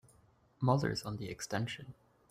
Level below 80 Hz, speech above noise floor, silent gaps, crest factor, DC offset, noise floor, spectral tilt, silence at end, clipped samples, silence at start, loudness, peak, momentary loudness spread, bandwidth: -64 dBFS; 32 dB; none; 20 dB; under 0.1%; -67 dBFS; -5.5 dB/octave; 0.35 s; under 0.1%; 0.6 s; -36 LUFS; -16 dBFS; 13 LU; 15.5 kHz